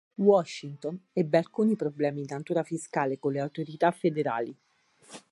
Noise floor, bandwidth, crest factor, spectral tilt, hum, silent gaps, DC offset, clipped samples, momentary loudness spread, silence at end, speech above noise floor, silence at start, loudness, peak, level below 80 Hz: -57 dBFS; 11.5 kHz; 20 dB; -6.5 dB/octave; none; none; under 0.1%; under 0.1%; 13 LU; 0.15 s; 29 dB; 0.2 s; -29 LUFS; -10 dBFS; -80 dBFS